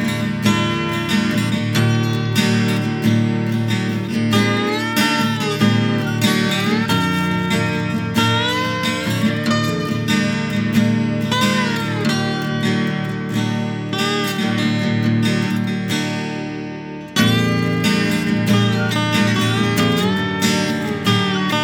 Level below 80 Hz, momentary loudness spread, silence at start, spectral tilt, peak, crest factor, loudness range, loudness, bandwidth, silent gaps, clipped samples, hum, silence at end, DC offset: -50 dBFS; 5 LU; 0 s; -5 dB/octave; -2 dBFS; 16 dB; 2 LU; -18 LUFS; 19.5 kHz; none; under 0.1%; none; 0 s; under 0.1%